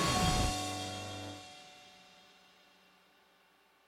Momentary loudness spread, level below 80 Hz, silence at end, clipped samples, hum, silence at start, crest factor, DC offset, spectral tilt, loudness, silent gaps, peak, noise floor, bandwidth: 26 LU; -48 dBFS; 1.9 s; under 0.1%; none; 0 s; 20 dB; under 0.1%; -3.5 dB/octave; -35 LUFS; none; -18 dBFS; -68 dBFS; 16.5 kHz